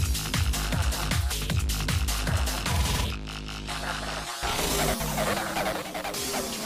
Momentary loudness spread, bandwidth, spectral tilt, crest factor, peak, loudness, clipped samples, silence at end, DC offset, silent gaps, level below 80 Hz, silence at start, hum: 6 LU; 16 kHz; -3.5 dB/octave; 16 dB; -12 dBFS; -28 LUFS; under 0.1%; 0 s; under 0.1%; none; -32 dBFS; 0 s; none